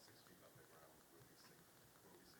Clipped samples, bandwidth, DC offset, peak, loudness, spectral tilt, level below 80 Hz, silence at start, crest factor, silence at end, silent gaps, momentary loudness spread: under 0.1%; 19 kHz; under 0.1%; -52 dBFS; -66 LUFS; -3.5 dB/octave; -88 dBFS; 0 s; 14 dB; 0 s; none; 2 LU